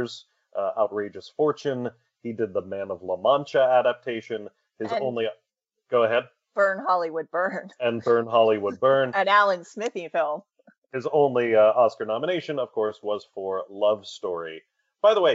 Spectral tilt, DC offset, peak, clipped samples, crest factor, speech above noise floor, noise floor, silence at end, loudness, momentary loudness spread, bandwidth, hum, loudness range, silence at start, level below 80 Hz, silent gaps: -3 dB/octave; under 0.1%; -6 dBFS; under 0.1%; 18 dB; 48 dB; -72 dBFS; 0 s; -24 LUFS; 14 LU; 8 kHz; none; 4 LU; 0 s; -80 dBFS; 10.78-10.82 s